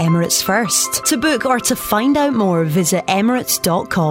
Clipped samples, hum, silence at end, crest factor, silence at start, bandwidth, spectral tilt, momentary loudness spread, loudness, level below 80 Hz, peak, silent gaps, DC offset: under 0.1%; none; 0 s; 14 dB; 0 s; 16.5 kHz; -4 dB/octave; 2 LU; -15 LUFS; -48 dBFS; -2 dBFS; none; under 0.1%